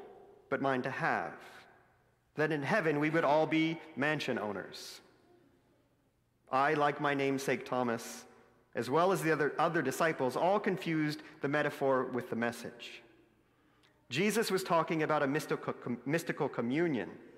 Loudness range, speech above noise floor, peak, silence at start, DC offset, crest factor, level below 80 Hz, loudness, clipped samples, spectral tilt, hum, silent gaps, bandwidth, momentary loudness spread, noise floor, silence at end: 4 LU; 41 dB; -16 dBFS; 0 s; under 0.1%; 18 dB; -78 dBFS; -33 LUFS; under 0.1%; -5.5 dB/octave; none; none; 16 kHz; 14 LU; -73 dBFS; 0 s